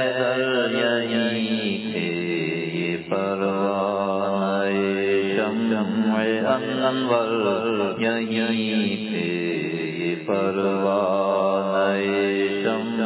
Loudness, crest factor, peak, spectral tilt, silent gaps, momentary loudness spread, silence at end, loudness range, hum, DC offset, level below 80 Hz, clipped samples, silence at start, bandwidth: -23 LUFS; 16 dB; -6 dBFS; -10 dB/octave; none; 4 LU; 0 s; 2 LU; none; under 0.1%; -64 dBFS; under 0.1%; 0 s; 4 kHz